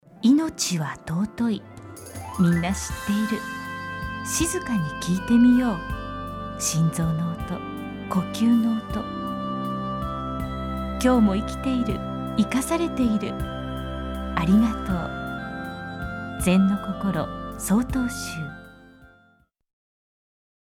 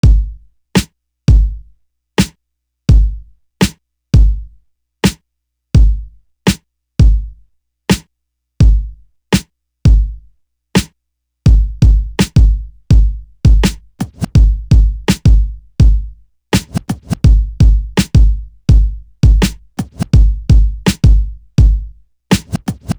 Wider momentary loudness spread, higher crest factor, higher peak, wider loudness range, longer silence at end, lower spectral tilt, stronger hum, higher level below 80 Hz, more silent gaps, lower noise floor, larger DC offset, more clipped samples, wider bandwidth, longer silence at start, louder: about the same, 12 LU vs 11 LU; first, 18 dB vs 12 dB; second, -8 dBFS vs 0 dBFS; about the same, 3 LU vs 3 LU; first, 1.7 s vs 0.05 s; about the same, -5.5 dB/octave vs -6 dB/octave; neither; second, -40 dBFS vs -14 dBFS; neither; second, -62 dBFS vs -72 dBFS; neither; neither; second, 16.5 kHz vs over 20 kHz; about the same, 0.15 s vs 0.05 s; second, -25 LUFS vs -14 LUFS